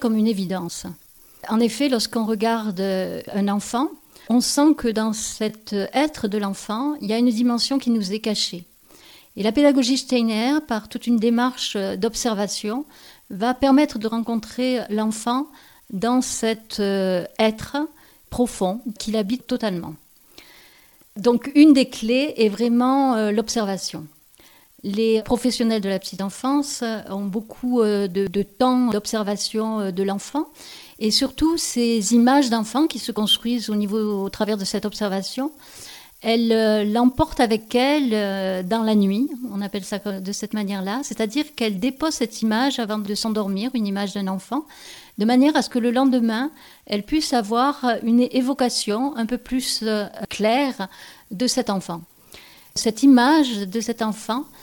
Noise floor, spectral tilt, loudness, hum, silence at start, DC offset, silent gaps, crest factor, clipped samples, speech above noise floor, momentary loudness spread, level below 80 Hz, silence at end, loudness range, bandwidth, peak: -52 dBFS; -4.5 dB/octave; -21 LUFS; none; 0 s; under 0.1%; none; 20 dB; under 0.1%; 31 dB; 10 LU; -50 dBFS; 0.15 s; 4 LU; 19 kHz; -2 dBFS